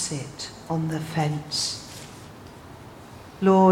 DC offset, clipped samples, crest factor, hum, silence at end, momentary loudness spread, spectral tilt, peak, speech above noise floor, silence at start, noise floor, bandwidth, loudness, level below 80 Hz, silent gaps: under 0.1%; under 0.1%; 20 dB; none; 0 s; 20 LU; -5 dB/octave; -6 dBFS; 21 dB; 0 s; -44 dBFS; 15.5 kHz; -26 LUFS; -58 dBFS; none